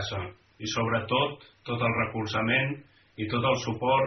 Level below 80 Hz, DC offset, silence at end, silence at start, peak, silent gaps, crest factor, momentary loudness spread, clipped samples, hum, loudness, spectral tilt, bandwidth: -58 dBFS; under 0.1%; 0 s; 0 s; -12 dBFS; none; 16 dB; 12 LU; under 0.1%; none; -28 LUFS; -3.5 dB/octave; 6.4 kHz